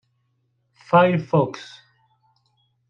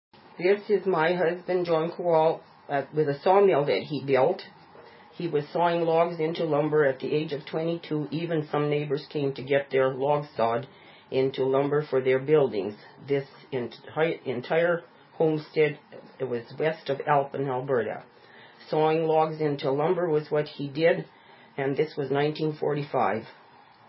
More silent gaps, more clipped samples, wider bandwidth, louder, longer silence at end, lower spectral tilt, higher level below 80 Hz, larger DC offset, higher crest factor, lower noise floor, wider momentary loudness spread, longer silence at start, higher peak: neither; neither; first, 7.4 kHz vs 5.8 kHz; first, -19 LUFS vs -26 LUFS; first, 1.25 s vs 0.55 s; second, -8 dB/octave vs -10.5 dB/octave; first, -66 dBFS vs -74 dBFS; neither; about the same, 20 dB vs 18 dB; first, -69 dBFS vs -50 dBFS; first, 21 LU vs 10 LU; first, 0.9 s vs 0.4 s; first, -4 dBFS vs -8 dBFS